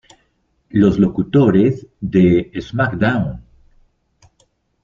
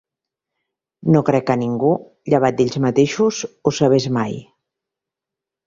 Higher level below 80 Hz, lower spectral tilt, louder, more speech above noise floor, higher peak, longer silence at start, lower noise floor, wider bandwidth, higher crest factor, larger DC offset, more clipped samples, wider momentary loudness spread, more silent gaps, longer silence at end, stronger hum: first, -44 dBFS vs -56 dBFS; first, -9 dB/octave vs -6.5 dB/octave; about the same, -16 LUFS vs -18 LUFS; second, 49 dB vs 69 dB; about the same, -2 dBFS vs -2 dBFS; second, 0.75 s vs 1.05 s; second, -63 dBFS vs -86 dBFS; about the same, 7.2 kHz vs 7.8 kHz; about the same, 16 dB vs 18 dB; neither; neither; first, 12 LU vs 7 LU; neither; first, 1.45 s vs 1.25 s; neither